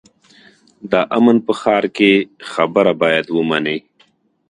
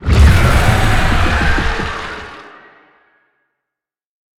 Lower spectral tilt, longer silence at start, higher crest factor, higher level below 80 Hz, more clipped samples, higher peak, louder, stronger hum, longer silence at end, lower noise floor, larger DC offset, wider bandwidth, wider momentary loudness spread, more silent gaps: about the same, -6 dB/octave vs -5.5 dB/octave; first, 0.85 s vs 0 s; about the same, 16 dB vs 14 dB; second, -60 dBFS vs -18 dBFS; neither; about the same, 0 dBFS vs 0 dBFS; about the same, -15 LUFS vs -13 LUFS; neither; second, 0.7 s vs 1.95 s; second, -57 dBFS vs -83 dBFS; neither; second, 10 kHz vs 15 kHz; second, 7 LU vs 18 LU; neither